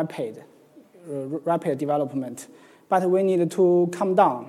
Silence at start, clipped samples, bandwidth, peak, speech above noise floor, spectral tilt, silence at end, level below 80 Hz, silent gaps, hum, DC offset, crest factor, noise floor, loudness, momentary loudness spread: 0 s; under 0.1%; 13 kHz; -4 dBFS; 29 dB; -7 dB/octave; 0 s; -78 dBFS; none; none; under 0.1%; 20 dB; -52 dBFS; -23 LUFS; 14 LU